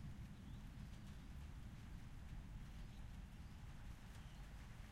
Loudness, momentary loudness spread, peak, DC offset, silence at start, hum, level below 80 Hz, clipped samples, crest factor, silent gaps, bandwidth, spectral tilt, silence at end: -57 LUFS; 2 LU; -42 dBFS; under 0.1%; 0 s; none; -56 dBFS; under 0.1%; 12 dB; none; 15.5 kHz; -6 dB/octave; 0 s